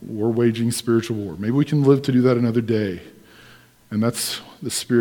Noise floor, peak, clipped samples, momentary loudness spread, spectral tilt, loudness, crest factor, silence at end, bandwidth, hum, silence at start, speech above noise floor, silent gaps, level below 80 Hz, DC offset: -49 dBFS; -4 dBFS; under 0.1%; 11 LU; -6 dB/octave; -21 LUFS; 16 dB; 0 s; 19 kHz; none; 0 s; 29 dB; none; -60 dBFS; under 0.1%